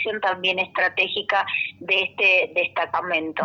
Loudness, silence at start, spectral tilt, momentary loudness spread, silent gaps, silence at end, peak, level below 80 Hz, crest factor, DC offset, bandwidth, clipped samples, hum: -21 LUFS; 0 s; -4 dB/octave; 7 LU; none; 0 s; -6 dBFS; -70 dBFS; 16 dB; under 0.1%; 7 kHz; under 0.1%; none